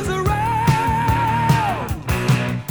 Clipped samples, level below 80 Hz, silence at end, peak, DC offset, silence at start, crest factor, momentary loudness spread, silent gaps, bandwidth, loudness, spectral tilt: under 0.1%; -32 dBFS; 0 s; -4 dBFS; under 0.1%; 0 s; 16 dB; 5 LU; none; over 20 kHz; -19 LUFS; -6 dB/octave